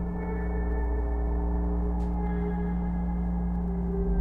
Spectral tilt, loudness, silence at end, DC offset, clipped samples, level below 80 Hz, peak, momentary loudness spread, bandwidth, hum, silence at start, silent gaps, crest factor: -11.5 dB/octave; -30 LUFS; 0 s; under 0.1%; under 0.1%; -30 dBFS; -16 dBFS; 1 LU; 2.4 kHz; none; 0 s; none; 12 dB